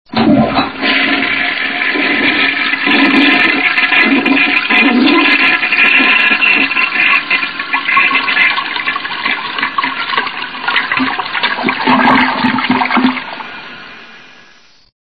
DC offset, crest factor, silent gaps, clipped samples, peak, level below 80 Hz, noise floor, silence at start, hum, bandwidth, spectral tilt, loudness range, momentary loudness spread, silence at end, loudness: 0.8%; 12 dB; none; under 0.1%; 0 dBFS; -48 dBFS; -45 dBFS; 0.1 s; none; 6 kHz; -5.5 dB/octave; 6 LU; 8 LU; 0.95 s; -10 LUFS